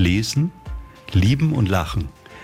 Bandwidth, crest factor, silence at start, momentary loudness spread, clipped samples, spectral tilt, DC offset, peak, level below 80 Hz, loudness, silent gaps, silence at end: 15.5 kHz; 14 dB; 0 s; 18 LU; under 0.1%; -6 dB/octave; under 0.1%; -6 dBFS; -36 dBFS; -20 LUFS; none; 0 s